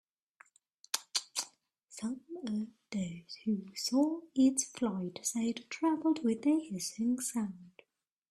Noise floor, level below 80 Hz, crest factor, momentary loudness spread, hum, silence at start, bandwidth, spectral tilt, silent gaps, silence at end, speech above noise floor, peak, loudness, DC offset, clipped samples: -77 dBFS; -76 dBFS; 22 dB; 11 LU; none; 0.95 s; 14.5 kHz; -4 dB/octave; none; 0.6 s; 44 dB; -14 dBFS; -34 LUFS; under 0.1%; under 0.1%